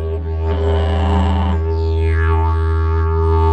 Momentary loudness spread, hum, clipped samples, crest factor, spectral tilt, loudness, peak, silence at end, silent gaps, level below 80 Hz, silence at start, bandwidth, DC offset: 3 LU; none; under 0.1%; 10 dB; -8.5 dB/octave; -17 LUFS; -4 dBFS; 0 s; none; -18 dBFS; 0 s; 5 kHz; under 0.1%